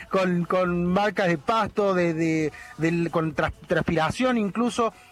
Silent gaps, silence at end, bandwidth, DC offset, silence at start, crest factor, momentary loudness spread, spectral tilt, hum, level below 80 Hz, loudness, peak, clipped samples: none; 0.2 s; 12.5 kHz; under 0.1%; 0 s; 16 dB; 4 LU; -6.5 dB/octave; none; -50 dBFS; -24 LUFS; -8 dBFS; under 0.1%